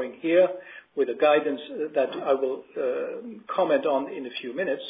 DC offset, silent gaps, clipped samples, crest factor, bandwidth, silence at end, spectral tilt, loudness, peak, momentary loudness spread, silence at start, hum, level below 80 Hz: under 0.1%; none; under 0.1%; 18 dB; 5 kHz; 0 s; -9 dB/octave; -26 LUFS; -8 dBFS; 12 LU; 0 s; none; -74 dBFS